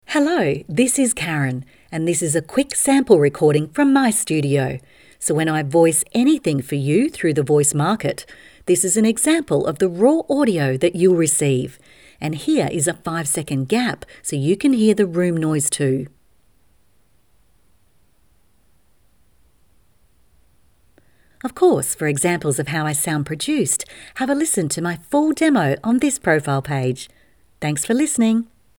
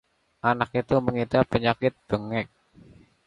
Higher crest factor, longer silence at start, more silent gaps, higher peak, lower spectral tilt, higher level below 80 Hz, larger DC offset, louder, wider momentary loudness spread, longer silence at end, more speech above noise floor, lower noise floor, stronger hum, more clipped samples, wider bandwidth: about the same, 20 dB vs 20 dB; second, 0.1 s vs 0.45 s; neither; first, 0 dBFS vs -6 dBFS; second, -5 dB/octave vs -8 dB/octave; about the same, -56 dBFS vs -52 dBFS; first, 0.1% vs under 0.1%; first, -18 LUFS vs -25 LUFS; about the same, 9 LU vs 8 LU; second, 0.35 s vs 0.8 s; first, 43 dB vs 29 dB; first, -61 dBFS vs -53 dBFS; neither; neither; first, 19.5 kHz vs 11 kHz